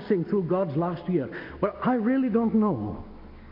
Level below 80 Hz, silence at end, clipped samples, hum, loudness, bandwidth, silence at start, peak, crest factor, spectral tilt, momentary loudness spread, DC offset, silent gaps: -52 dBFS; 0 s; under 0.1%; none; -26 LUFS; 5.4 kHz; 0 s; -10 dBFS; 16 dB; -11.5 dB/octave; 12 LU; under 0.1%; none